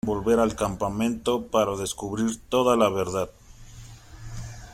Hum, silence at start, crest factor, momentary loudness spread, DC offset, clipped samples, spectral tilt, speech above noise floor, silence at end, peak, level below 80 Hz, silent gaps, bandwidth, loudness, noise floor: none; 0.05 s; 20 dB; 18 LU; under 0.1%; under 0.1%; -5 dB/octave; 20 dB; 0 s; -6 dBFS; -46 dBFS; none; 16 kHz; -25 LUFS; -44 dBFS